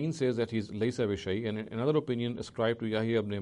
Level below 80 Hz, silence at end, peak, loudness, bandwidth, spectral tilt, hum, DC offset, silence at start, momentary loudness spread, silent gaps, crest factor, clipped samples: -62 dBFS; 0 s; -16 dBFS; -32 LUFS; 11 kHz; -6.5 dB/octave; none; under 0.1%; 0 s; 4 LU; none; 16 dB; under 0.1%